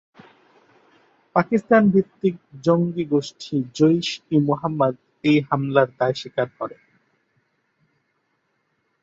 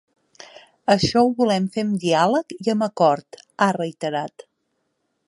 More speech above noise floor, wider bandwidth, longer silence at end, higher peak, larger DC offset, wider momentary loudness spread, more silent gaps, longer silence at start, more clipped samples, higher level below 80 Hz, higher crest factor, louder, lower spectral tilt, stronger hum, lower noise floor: about the same, 50 dB vs 53 dB; second, 7.8 kHz vs 11.5 kHz; first, 2.3 s vs 1 s; about the same, -2 dBFS vs -4 dBFS; neither; about the same, 9 LU vs 10 LU; neither; first, 1.35 s vs 0.4 s; neither; second, -64 dBFS vs -54 dBFS; about the same, 20 dB vs 18 dB; about the same, -21 LUFS vs -21 LUFS; first, -7 dB/octave vs -5.5 dB/octave; neither; about the same, -71 dBFS vs -73 dBFS